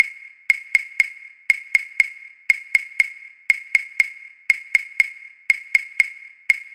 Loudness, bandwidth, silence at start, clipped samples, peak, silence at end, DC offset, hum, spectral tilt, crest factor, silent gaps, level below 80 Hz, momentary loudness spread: -20 LUFS; 16 kHz; 0 s; under 0.1%; 0 dBFS; 0.1 s; under 0.1%; none; 3.5 dB/octave; 22 dB; none; -70 dBFS; 13 LU